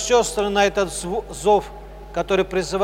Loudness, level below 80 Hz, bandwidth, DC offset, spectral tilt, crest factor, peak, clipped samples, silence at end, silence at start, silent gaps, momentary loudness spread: -21 LUFS; -40 dBFS; 16 kHz; under 0.1%; -3.5 dB/octave; 18 dB; -2 dBFS; under 0.1%; 0 s; 0 s; none; 11 LU